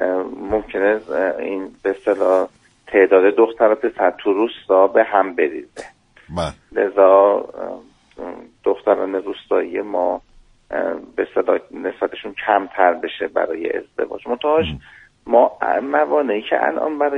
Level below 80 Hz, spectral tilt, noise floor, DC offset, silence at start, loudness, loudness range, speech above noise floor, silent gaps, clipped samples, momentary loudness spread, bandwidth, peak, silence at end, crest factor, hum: -50 dBFS; -6.5 dB/octave; -42 dBFS; under 0.1%; 0 s; -18 LUFS; 6 LU; 24 dB; none; under 0.1%; 14 LU; 10 kHz; 0 dBFS; 0 s; 18 dB; none